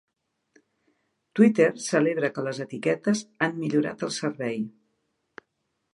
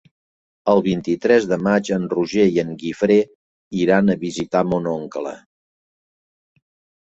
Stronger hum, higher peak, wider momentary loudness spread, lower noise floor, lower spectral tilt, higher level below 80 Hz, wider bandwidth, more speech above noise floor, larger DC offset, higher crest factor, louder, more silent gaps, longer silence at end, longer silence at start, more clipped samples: neither; second, -6 dBFS vs -2 dBFS; about the same, 11 LU vs 10 LU; second, -78 dBFS vs under -90 dBFS; about the same, -5.5 dB/octave vs -6.5 dB/octave; second, -74 dBFS vs -56 dBFS; first, 11.5 kHz vs 8 kHz; second, 53 dB vs over 72 dB; neither; about the same, 20 dB vs 18 dB; second, -25 LUFS vs -19 LUFS; second, none vs 3.35-3.71 s; second, 1.25 s vs 1.65 s; first, 1.35 s vs 0.65 s; neither